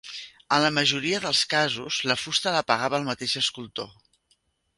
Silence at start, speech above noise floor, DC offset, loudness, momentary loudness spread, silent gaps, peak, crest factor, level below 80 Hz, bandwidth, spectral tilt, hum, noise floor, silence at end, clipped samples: 0.05 s; 44 dB; under 0.1%; -24 LUFS; 14 LU; none; -6 dBFS; 22 dB; -64 dBFS; 11.5 kHz; -2.5 dB/octave; none; -69 dBFS; 0.9 s; under 0.1%